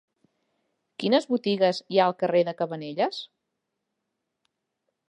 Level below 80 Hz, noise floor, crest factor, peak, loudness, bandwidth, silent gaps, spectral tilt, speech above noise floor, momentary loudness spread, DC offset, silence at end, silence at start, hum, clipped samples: -80 dBFS; -82 dBFS; 20 dB; -8 dBFS; -25 LUFS; 10.5 kHz; none; -6 dB/octave; 57 dB; 11 LU; under 0.1%; 1.85 s; 1 s; none; under 0.1%